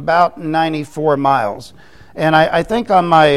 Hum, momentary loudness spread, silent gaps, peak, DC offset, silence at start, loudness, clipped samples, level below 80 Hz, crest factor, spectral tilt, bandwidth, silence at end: none; 9 LU; none; 0 dBFS; 0.7%; 0 s; -15 LUFS; under 0.1%; -46 dBFS; 14 dB; -6 dB/octave; 13.5 kHz; 0 s